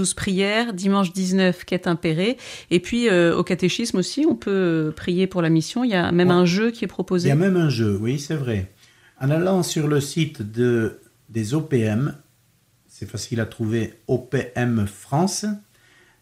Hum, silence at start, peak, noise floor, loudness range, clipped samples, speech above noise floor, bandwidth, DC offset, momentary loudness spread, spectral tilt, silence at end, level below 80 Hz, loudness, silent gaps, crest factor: none; 0 s; -4 dBFS; -61 dBFS; 6 LU; under 0.1%; 40 dB; 15 kHz; under 0.1%; 9 LU; -5.5 dB/octave; 0.65 s; -54 dBFS; -22 LUFS; none; 16 dB